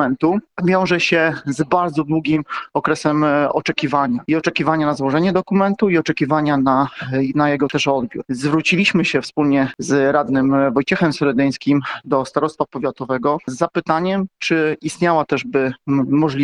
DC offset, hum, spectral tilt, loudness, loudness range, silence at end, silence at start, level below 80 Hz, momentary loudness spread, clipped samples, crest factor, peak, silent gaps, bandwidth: under 0.1%; none; -6 dB/octave; -18 LUFS; 3 LU; 0 s; 0 s; -54 dBFS; 5 LU; under 0.1%; 16 dB; -2 dBFS; none; 11 kHz